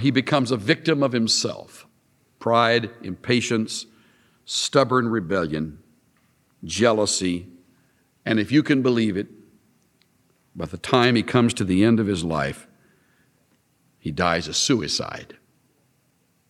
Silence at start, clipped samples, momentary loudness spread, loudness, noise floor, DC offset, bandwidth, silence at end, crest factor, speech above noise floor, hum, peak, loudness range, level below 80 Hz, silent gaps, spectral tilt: 0 s; under 0.1%; 15 LU; -22 LUFS; -65 dBFS; under 0.1%; 13 kHz; 1.2 s; 20 dB; 44 dB; none; -2 dBFS; 3 LU; -54 dBFS; none; -4.5 dB/octave